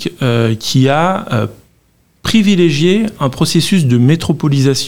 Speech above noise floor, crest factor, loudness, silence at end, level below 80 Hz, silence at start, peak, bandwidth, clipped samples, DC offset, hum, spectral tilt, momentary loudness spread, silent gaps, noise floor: 42 dB; 12 dB; -12 LUFS; 0 s; -44 dBFS; 0 s; 0 dBFS; 17 kHz; under 0.1%; 2%; none; -5.5 dB/octave; 7 LU; none; -54 dBFS